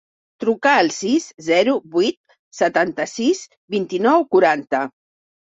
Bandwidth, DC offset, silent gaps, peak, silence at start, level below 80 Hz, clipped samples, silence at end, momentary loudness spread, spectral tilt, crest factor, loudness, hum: 8 kHz; under 0.1%; 2.17-2.24 s, 2.39-2.51 s, 3.57-3.68 s; -2 dBFS; 0.4 s; -64 dBFS; under 0.1%; 0.55 s; 9 LU; -4 dB/octave; 18 dB; -19 LUFS; none